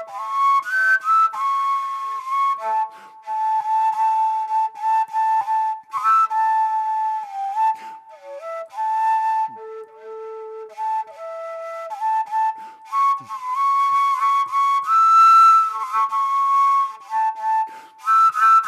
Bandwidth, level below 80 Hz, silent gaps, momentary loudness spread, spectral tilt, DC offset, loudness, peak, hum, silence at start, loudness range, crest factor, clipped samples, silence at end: 14 kHz; under -90 dBFS; none; 16 LU; 0 dB/octave; under 0.1%; -19 LUFS; -6 dBFS; none; 0 s; 10 LU; 14 dB; under 0.1%; 0 s